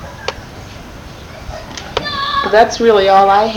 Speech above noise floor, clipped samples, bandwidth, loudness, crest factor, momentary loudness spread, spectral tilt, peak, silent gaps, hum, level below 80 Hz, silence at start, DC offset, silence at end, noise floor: 22 dB; 0.1%; 19 kHz; -12 LUFS; 14 dB; 23 LU; -4 dB/octave; 0 dBFS; none; none; -36 dBFS; 0 s; under 0.1%; 0 s; -32 dBFS